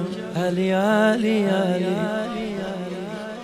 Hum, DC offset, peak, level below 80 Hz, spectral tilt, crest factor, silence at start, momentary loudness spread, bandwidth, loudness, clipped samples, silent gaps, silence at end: none; under 0.1%; -8 dBFS; -58 dBFS; -6.5 dB/octave; 14 dB; 0 s; 12 LU; 15.5 kHz; -23 LUFS; under 0.1%; none; 0 s